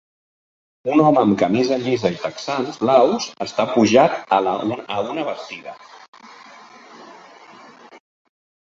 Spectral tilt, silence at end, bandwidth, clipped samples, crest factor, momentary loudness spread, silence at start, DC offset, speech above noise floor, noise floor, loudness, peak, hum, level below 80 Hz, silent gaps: -5.5 dB/octave; 0.75 s; 7.8 kHz; under 0.1%; 20 dB; 13 LU; 0.85 s; under 0.1%; 26 dB; -44 dBFS; -18 LUFS; -2 dBFS; none; -62 dBFS; 6.08-6.13 s